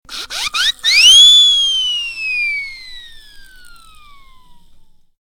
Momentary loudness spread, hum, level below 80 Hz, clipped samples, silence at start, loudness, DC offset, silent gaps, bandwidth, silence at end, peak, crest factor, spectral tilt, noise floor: 20 LU; none; -44 dBFS; under 0.1%; 0.1 s; -8 LUFS; under 0.1%; none; 18 kHz; 1.75 s; 0 dBFS; 14 dB; 4 dB/octave; -43 dBFS